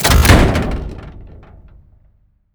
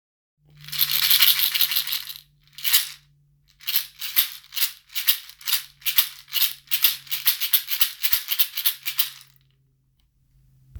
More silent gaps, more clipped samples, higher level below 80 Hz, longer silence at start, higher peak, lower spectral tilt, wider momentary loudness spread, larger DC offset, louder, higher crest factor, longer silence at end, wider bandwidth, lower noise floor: neither; neither; first, -20 dBFS vs -60 dBFS; second, 0 s vs 0.6 s; about the same, 0 dBFS vs 0 dBFS; first, -4.5 dB/octave vs 3 dB/octave; first, 25 LU vs 9 LU; neither; first, -13 LUFS vs -20 LUFS; second, 16 dB vs 24 dB; first, 1.25 s vs 0 s; about the same, over 20 kHz vs over 20 kHz; second, -54 dBFS vs -65 dBFS